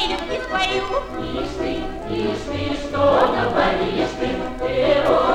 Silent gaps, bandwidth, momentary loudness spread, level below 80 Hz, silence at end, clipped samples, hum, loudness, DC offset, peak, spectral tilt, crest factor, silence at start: none; 13 kHz; 9 LU; -36 dBFS; 0 s; under 0.1%; none; -21 LUFS; under 0.1%; -4 dBFS; -5.5 dB/octave; 16 dB; 0 s